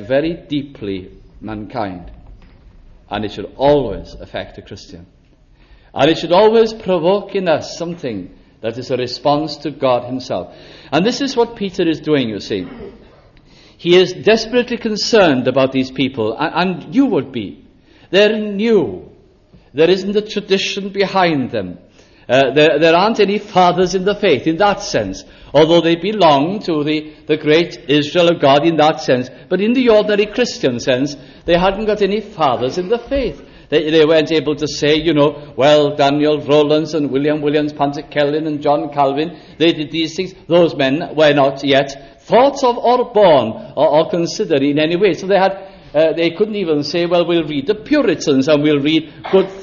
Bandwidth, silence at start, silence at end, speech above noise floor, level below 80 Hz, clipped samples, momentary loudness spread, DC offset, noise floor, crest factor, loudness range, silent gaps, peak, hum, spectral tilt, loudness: 7.4 kHz; 0 s; 0 s; 34 dB; -44 dBFS; under 0.1%; 13 LU; under 0.1%; -48 dBFS; 14 dB; 6 LU; none; 0 dBFS; none; -5.5 dB/octave; -15 LUFS